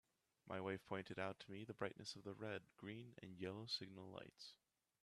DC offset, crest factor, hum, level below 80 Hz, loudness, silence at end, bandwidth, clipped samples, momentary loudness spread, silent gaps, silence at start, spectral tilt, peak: under 0.1%; 24 dB; none; -86 dBFS; -52 LUFS; 0.5 s; 13 kHz; under 0.1%; 10 LU; none; 0.45 s; -5 dB/octave; -30 dBFS